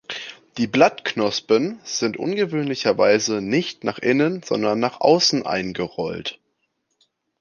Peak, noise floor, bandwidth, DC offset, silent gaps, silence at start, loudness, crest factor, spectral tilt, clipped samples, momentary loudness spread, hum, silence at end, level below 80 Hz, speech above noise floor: -2 dBFS; -72 dBFS; 10 kHz; under 0.1%; none; 0.1 s; -21 LUFS; 20 dB; -4 dB/octave; under 0.1%; 10 LU; none; 1.05 s; -60 dBFS; 52 dB